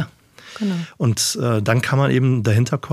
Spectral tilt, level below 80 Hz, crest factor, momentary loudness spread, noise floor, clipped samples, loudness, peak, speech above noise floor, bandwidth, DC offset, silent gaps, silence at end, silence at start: -5.5 dB/octave; -56 dBFS; 18 dB; 9 LU; -44 dBFS; under 0.1%; -19 LUFS; -2 dBFS; 26 dB; 15 kHz; under 0.1%; none; 0 s; 0 s